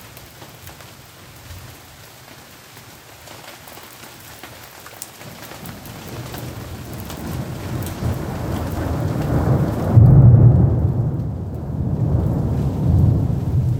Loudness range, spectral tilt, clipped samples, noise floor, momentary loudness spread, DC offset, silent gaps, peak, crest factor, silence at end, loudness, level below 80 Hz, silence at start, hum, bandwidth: 23 LU; -8 dB/octave; under 0.1%; -42 dBFS; 27 LU; under 0.1%; none; 0 dBFS; 20 dB; 0 s; -18 LUFS; -32 dBFS; 0 s; none; 18.5 kHz